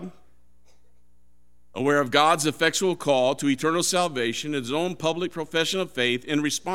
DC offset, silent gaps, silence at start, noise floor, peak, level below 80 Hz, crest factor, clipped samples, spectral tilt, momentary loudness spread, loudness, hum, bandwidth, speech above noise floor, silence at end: 0.4%; none; 0 s; -64 dBFS; -2 dBFS; -64 dBFS; 22 dB; under 0.1%; -3.5 dB/octave; 7 LU; -24 LUFS; 60 Hz at -55 dBFS; 16.5 kHz; 41 dB; 0 s